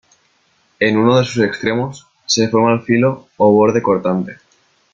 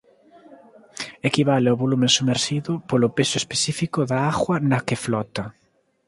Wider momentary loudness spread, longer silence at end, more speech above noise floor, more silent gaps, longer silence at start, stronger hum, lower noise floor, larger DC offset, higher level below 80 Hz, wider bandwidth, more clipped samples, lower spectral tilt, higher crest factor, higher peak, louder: second, 10 LU vs 13 LU; about the same, 0.6 s vs 0.55 s; first, 44 dB vs 30 dB; neither; first, 0.8 s vs 0.5 s; neither; first, -59 dBFS vs -51 dBFS; neither; about the same, -54 dBFS vs -56 dBFS; second, 7.8 kHz vs 11.5 kHz; neither; about the same, -5 dB/octave vs -4.5 dB/octave; second, 14 dB vs 20 dB; about the same, -2 dBFS vs -2 dBFS; first, -15 LUFS vs -21 LUFS